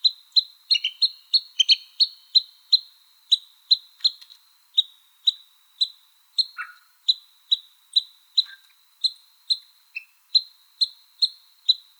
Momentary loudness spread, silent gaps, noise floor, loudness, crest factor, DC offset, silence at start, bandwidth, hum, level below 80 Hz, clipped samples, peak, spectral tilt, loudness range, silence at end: 8 LU; none; -55 dBFS; -22 LUFS; 22 dB; under 0.1%; 0.05 s; over 20 kHz; none; under -90 dBFS; under 0.1%; -4 dBFS; 12.5 dB/octave; 5 LU; 0.25 s